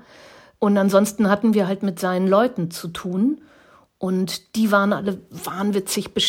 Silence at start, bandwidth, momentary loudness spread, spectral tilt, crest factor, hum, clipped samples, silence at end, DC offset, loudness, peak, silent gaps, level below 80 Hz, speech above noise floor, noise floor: 0.6 s; 17 kHz; 10 LU; -5 dB/octave; 18 dB; none; under 0.1%; 0 s; under 0.1%; -21 LUFS; -4 dBFS; none; -60 dBFS; 27 dB; -47 dBFS